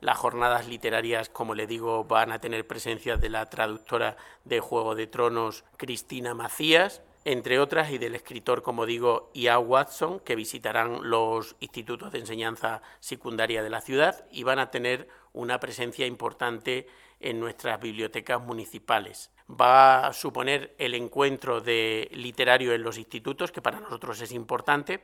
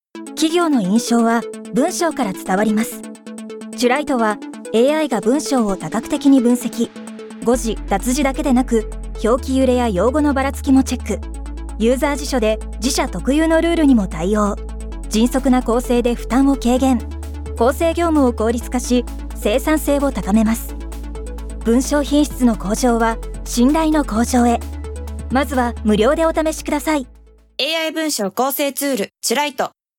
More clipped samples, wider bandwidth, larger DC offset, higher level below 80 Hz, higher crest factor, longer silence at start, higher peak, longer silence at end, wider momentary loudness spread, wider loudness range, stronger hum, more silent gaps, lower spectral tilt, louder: neither; about the same, 19 kHz vs 18.5 kHz; neither; second, -48 dBFS vs -30 dBFS; first, 26 dB vs 14 dB; second, 0 s vs 0.15 s; about the same, -2 dBFS vs -4 dBFS; second, 0.05 s vs 0.3 s; about the same, 13 LU vs 14 LU; first, 7 LU vs 2 LU; neither; neither; second, -3.5 dB/octave vs -5 dB/octave; second, -27 LUFS vs -17 LUFS